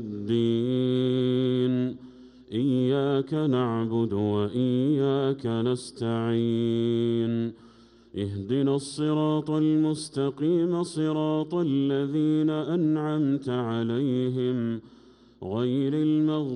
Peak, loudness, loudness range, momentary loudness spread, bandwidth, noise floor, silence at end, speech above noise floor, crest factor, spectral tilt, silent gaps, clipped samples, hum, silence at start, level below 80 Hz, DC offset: -14 dBFS; -26 LUFS; 2 LU; 6 LU; 11 kHz; -51 dBFS; 0 s; 26 dB; 12 dB; -7.5 dB/octave; none; under 0.1%; none; 0 s; -66 dBFS; under 0.1%